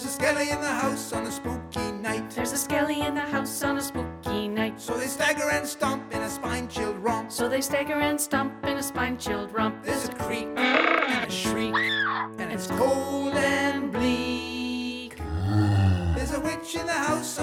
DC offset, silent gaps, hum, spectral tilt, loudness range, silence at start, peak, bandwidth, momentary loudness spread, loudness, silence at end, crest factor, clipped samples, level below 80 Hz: under 0.1%; none; none; -4.5 dB/octave; 3 LU; 0 s; -6 dBFS; 18 kHz; 7 LU; -27 LUFS; 0 s; 20 dB; under 0.1%; -46 dBFS